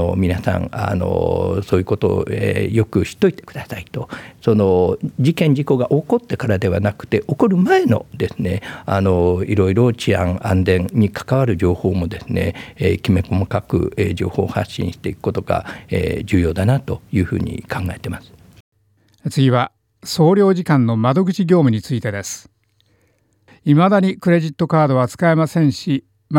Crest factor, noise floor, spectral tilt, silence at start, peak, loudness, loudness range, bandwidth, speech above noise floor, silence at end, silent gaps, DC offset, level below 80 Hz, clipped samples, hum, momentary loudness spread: 16 dB; -60 dBFS; -7.5 dB/octave; 0 s; -2 dBFS; -18 LUFS; 4 LU; 16.5 kHz; 43 dB; 0 s; 18.60-18.72 s; under 0.1%; -46 dBFS; under 0.1%; none; 10 LU